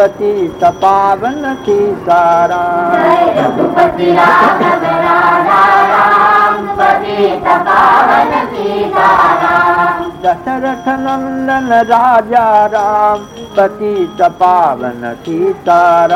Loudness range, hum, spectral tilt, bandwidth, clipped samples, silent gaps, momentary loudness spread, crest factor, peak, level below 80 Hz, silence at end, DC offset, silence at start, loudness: 3 LU; none; -5.5 dB/octave; 16 kHz; 0.4%; none; 8 LU; 10 dB; 0 dBFS; -44 dBFS; 0 s; under 0.1%; 0 s; -10 LUFS